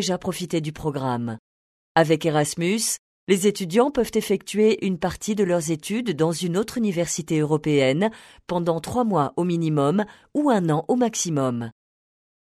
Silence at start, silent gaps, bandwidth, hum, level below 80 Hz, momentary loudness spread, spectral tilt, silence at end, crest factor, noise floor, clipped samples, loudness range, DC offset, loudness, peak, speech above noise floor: 0 s; 1.39-1.95 s, 2.99-3.27 s; 13.5 kHz; none; -56 dBFS; 7 LU; -5 dB/octave; 0.75 s; 20 dB; under -90 dBFS; under 0.1%; 1 LU; under 0.1%; -23 LUFS; -2 dBFS; over 68 dB